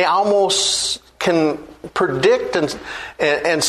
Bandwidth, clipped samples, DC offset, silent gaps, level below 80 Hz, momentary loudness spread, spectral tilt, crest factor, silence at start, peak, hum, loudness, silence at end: 13.5 kHz; under 0.1%; under 0.1%; none; -52 dBFS; 11 LU; -2.5 dB/octave; 16 dB; 0 s; -2 dBFS; none; -18 LUFS; 0 s